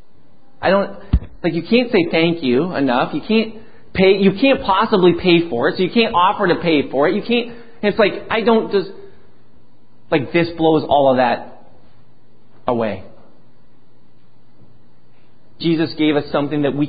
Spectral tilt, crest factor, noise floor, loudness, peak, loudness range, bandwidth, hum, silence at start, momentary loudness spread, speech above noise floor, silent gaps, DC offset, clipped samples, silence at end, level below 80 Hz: -11.5 dB/octave; 18 dB; -54 dBFS; -17 LUFS; 0 dBFS; 13 LU; 5 kHz; none; 0.6 s; 9 LU; 38 dB; none; 2%; under 0.1%; 0 s; -36 dBFS